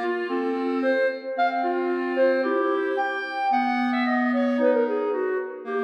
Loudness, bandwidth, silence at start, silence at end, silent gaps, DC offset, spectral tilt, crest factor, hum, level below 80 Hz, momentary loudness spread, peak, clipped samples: -24 LUFS; 6.2 kHz; 0 s; 0 s; none; under 0.1%; -5.5 dB/octave; 14 dB; none; -88 dBFS; 5 LU; -10 dBFS; under 0.1%